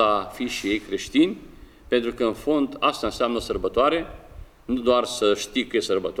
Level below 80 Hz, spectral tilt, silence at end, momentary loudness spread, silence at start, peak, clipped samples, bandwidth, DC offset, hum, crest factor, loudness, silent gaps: -46 dBFS; -4 dB/octave; 0 s; 7 LU; 0 s; -4 dBFS; under 0.1%; 16 kHz; under 0.1%; none; 20 dB; -24 LUFS; none